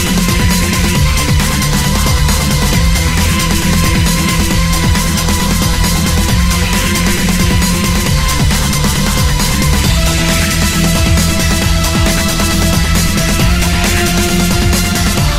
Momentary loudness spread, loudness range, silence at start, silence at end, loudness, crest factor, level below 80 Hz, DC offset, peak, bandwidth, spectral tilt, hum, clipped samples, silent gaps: 1 LU; 0 LU; 0 s; 0 s; -12 LUFS; 10 dB; -16 dBFS; under 0.1%; 0 dBFS; 16.5 kHz; -4 dB/octave; none; under 0.1%; none